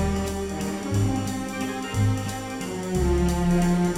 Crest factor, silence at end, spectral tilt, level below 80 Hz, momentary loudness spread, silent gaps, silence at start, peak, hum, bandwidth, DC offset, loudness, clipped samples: 12 dB; 0 s; -6 dB/octave; -34 dBFS; 8 LU; none; 0 s; -12 dBFS; none; 15.5 kHz; under 0.1%; -26 LUFS; under 0.1%